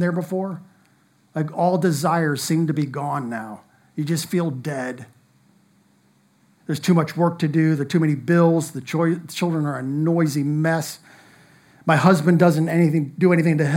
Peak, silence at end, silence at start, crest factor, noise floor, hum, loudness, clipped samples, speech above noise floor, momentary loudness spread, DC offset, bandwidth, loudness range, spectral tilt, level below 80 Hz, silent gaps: -2 dBFS; 0 s; 0 s; 18 dB; -59 dBFS; none; -21 LUFS; under 0.1%; 39 dB; 13 LU; under 0.1%; 16.5 kHz; 8 LU; -6.5 dB/octave; -70 dBFS; none